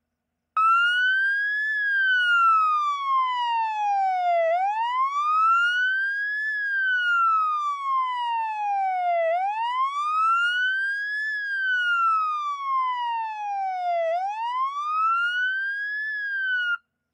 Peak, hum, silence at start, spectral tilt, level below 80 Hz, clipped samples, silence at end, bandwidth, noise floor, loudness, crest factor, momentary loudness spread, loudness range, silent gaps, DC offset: -14 dBFS; none; 0.55 s; 3 dB/octave; under -90 dBFS; under 0.1%; 0.35 s; 10 kHz; -80 dBFS; -23 LUFS; 10 dB; 7 LU; 4 LU; none; under 0.1%